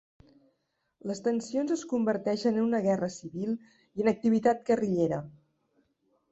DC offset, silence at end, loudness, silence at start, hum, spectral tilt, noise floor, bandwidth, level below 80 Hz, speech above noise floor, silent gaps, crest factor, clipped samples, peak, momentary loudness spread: under 0.1%; 1 s; -29 LUFS; 1.05 s; none; -6.5 dB/octave; -78 dBFS; 8 kHz; -68 dBFS; 50 dB; none; 18 dB; under 0.1%; -12 dBFS; 11 LU